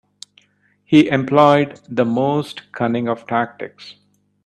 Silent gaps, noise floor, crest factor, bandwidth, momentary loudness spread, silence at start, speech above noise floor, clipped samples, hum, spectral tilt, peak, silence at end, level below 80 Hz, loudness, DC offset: none; -60 dBFS; 18 dB; 10 kHz; 13 LU; 0.9 s; 43 dB; under 0.1%; 50 Hz at -45 dBFS; -7 dB/octave; 0 dBFS; 0.55 s; -60 dBFS; -17 LUFS; under 0.1%